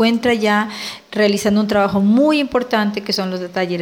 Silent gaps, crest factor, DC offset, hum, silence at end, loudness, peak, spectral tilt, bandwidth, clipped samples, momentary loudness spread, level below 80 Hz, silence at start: none; 14 dB; under 0.1%; none; 0 s; -17 LUFS; -2 dBFS; -5 dB/octave; 16.5 kHz; under 0.1%; 8 LU; -52 dBFS; 0 s